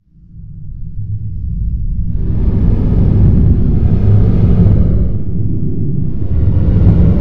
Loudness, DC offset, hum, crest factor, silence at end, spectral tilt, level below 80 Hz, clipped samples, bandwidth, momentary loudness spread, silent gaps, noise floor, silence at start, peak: -13 LUFS; 10%; none; 12 dB; 0 s; -12 dB/octave; -16 dBFS; under 0.1%; 3.3 kHz; 13 LU; none; -34 dBFS; 0 s; 0 dBFS